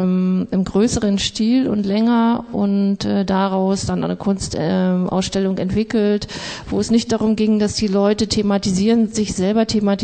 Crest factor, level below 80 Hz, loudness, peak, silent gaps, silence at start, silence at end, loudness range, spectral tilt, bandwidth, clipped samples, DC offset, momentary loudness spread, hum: 12 dB; -42 dBFS; -18 LUFS; -6 dBFS; none; 0 s; 0 s; 2 LU; -5.5 dB/octave; 9.2 kHz; under 0.1%; under 0.1%; 4 LU; none